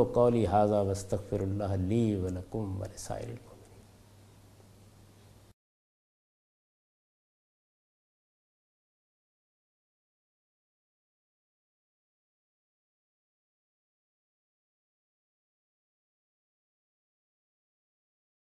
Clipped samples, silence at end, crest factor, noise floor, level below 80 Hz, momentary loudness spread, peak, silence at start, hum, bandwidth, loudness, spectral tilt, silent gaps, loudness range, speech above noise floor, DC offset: under 0.1%; 14.65 s; 24 dB; -57 dBFS; -54 dBFS; 14 LU; -12 dBFS; 0 s; none; 13.5 kHz; -31 LUFS; -7.5 dB/octave; none; 18 LU; 28 dB; under 0.1%